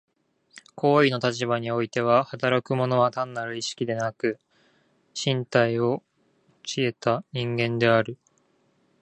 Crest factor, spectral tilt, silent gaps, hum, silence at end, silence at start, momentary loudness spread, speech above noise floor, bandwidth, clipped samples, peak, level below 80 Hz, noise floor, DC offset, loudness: 22 dB; -5.5 dB/octave; none; none; 0.85 s; 0.55 s; 10 LU; 42 dB; 9.6 kHz; under 0.1%; -4 dBFS; -66 dBFS; -66 dBFS; under 0.1%; -25 LUFS